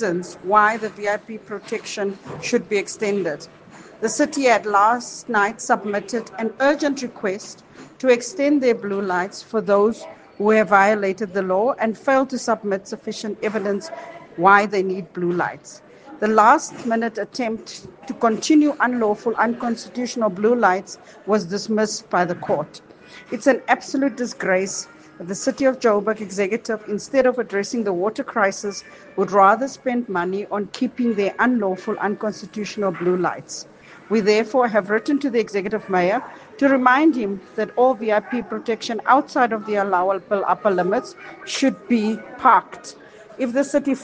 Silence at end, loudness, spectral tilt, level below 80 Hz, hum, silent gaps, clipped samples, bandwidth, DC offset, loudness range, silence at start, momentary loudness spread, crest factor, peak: 0 s; -20 LUFS; -4.5 dB/octave; -66 dBFS; none; none; under 0.1%; 10 kHz; under 0.1%; 3 LU; 0 s; 13 LU; 20 dB; 0 dBFS